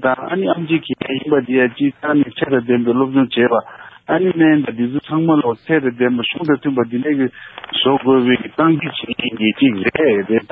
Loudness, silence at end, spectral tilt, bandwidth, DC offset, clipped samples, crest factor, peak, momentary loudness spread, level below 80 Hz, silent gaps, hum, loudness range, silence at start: -16 LUFS; 0.05 s; -10 dB/octave; 4.5 kHz; under 0.1%; under 0.1%; 14 dB; -2 dBFS; 7 LU; -56 dBFS; none; none; 1 LU; 0 s